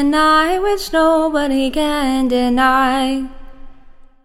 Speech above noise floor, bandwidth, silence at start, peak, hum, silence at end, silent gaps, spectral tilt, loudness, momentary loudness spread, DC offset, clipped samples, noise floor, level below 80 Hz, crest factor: 25 dB; 16.5 kHz; 0 s; -2 dBFS; none; 0.2 s; none; -3.5 dB/octave; -15 LUFS; 6 LU; under 0.1%; under 0.1%; -40 dBFS; -34 dBFS; 14 dB